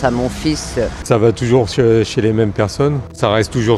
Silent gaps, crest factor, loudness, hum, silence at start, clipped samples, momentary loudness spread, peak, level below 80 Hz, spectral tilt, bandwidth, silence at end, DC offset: none; 14 dB; -15 LUFS; none; 0 s; under 0.1%; 6 LU; 0 dBFS; -34 dBFS; -6 dB/octave; 13 kHz; 0 s; under 0.1%